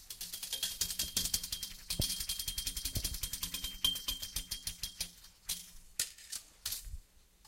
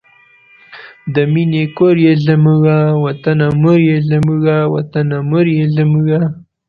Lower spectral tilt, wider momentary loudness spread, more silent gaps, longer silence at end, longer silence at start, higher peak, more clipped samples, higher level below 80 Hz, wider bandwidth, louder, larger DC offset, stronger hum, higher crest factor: second, -0.5 dB/octave vs -10 dB/octave; first, 9 LU vs 6 LU; neither; second, 0 s vs 0.3 s; second, 0 s vs 0.7 s; second, -14 dBFS vs 0 dBFS; neither; about the same, -50 dBFS vs -46 dBFS; first, 17 kHz vs 5 kHz; second, -37 LUFS vs -12 LUFS; neither; neither; first, 26 dB vs 12 dB